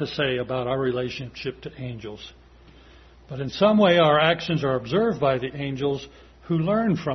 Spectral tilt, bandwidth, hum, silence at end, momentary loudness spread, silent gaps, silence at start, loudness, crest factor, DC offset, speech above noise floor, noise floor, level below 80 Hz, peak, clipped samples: -7 dB/octave; 6.4 kHz; none; 0 s; 19 LU; none; 0 s; -23 LUFS; 20 dB; under 0.1%; 27 dB; -50 dBFS; -52 dBFS; -4 dBFS; under 0.1%